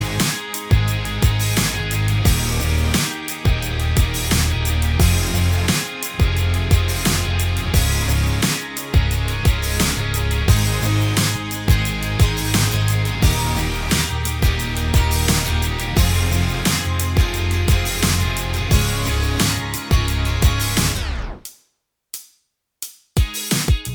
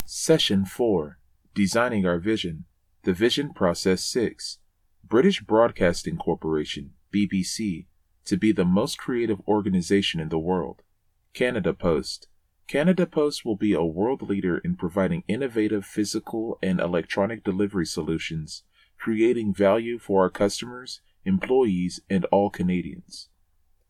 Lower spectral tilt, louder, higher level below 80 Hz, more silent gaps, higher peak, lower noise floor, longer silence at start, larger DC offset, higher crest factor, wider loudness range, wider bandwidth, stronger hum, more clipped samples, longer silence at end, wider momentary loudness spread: second, -4 dB/octave vs -5.5 dB/octave; first, -19 LUFS vs -25 LUFS; first, -24 dBFS vs -52 dBFS; neither; first, -2 dBFS vs -6 dBFS; about the same, -69 dBFS vs -67 dBFS; about the same, 0 s vs 0 s; neither; about the same, 18 dB vs 20 dB; about the same, 2 LU vs 2 LU; first, over 20 kHz vs 15 kHz; neither; neither; second, 0 s vs 0.65 s; second, 5 LU vs 13 LU